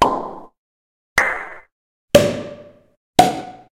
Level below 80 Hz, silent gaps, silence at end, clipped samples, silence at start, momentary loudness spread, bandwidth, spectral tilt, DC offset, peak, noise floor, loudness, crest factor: -46 dBFS; 0.58-1.16 s, 1.72-2.08 s, 2.97-3.13 s; 0.15 s; under 0.1%; 0 s; 19 LU; 16.5 kHz; -4 dB/octave; under 0.1%; 0 dBFS; -39 dBFS; -18 LUFS; 20 dB